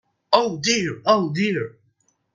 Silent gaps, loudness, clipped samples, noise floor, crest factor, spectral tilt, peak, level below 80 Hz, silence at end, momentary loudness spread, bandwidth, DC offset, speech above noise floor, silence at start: none; -21 LUFS; under 0.1%; -66 dBFS; 22 dB; -4 dB/octave; 0 dBFS; -64 dBFS; 0.65 s; 6 LU; 9.6 kHz; under 0.1%; 45 dB; 0.3 s